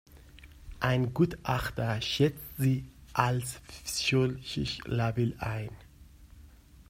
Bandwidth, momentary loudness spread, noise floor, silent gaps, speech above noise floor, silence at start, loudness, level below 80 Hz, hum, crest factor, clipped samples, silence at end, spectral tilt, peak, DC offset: 16 kHz; 8 LU; -54 dBFS; none; 24 dB; 0.15 s; -31 LUFS; -50 dBFS; none; 26 dB; under 0.1%; 0.4 s; -5.5 dB/octave; -6 dBFS; under 0.1%